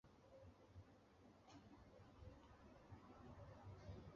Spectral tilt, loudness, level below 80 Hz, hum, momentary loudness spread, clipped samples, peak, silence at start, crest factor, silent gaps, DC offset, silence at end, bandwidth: -6.5 dB/octave; -65 LUFS; -70 dBFS; none; 6 LU; under 0.1%; -46 dBFS; 0.05 s; 16 dB; none; under 0.1%; 0 s; 7.2 kHz